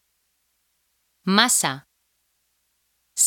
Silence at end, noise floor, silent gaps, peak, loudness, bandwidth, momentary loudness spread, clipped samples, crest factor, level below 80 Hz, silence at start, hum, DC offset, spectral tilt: 0 s; -71 dBFS; none; 0 dBFS; -20 LUFS; 18 kHz; 17 LU; under 0.1%; 26 dB; -74 dBFS; 1.25 s; none; under 0.1%; -1.5 dB/octave